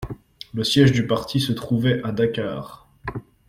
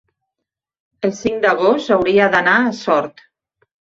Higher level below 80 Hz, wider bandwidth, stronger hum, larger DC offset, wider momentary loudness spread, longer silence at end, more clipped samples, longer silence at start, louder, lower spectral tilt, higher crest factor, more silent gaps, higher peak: first, -48 dBFS vs -56 dBFS; first, 15.5 kHz vs 7.6 kHz; neither; neither; first, 19 LU vs 9 LU; second, 0.25 s vs 0.9 s; neither; second, 0 s vs 1 s; second, -21 LUFS vs -15 LUFS; about the same, -6 dB/octave vs -5 dB/octave; about the same, 18 dB vs 16 dB; neither; about the same, -4 dBFS vs -2 dBFS